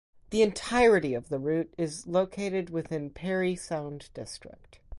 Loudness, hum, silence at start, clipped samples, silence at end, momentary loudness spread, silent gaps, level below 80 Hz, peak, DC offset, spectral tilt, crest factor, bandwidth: -28 LUFS; none; 0.3 s; under 0.1%; 0 s; 18 LU; none; -54 dBFS; -12 dBFS; under 0.1%; -5.5 dB/octave; 18 dB; 11.5 kHz